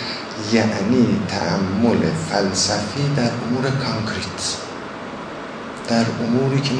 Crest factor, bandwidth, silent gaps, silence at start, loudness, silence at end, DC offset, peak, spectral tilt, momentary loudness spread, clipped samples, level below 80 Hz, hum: 18 dB; 10.5 kHz; none; 0 s; -20 LUFS; 0 s; under 0.1%; -4 dBFS; -5 dB/octave; 13 LU; under 0.1%; -52 dBFS; none